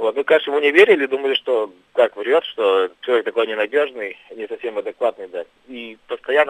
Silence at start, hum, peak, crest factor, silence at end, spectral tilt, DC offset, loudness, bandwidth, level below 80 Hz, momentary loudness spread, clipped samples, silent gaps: 0 s; none; 0 dBFS; 18 dB; 0 s; -4 dB/octave; under 0.1%; -18 LUFS; 10.5 kHz; -70 dBFS; 18 LU; under 0.1%; none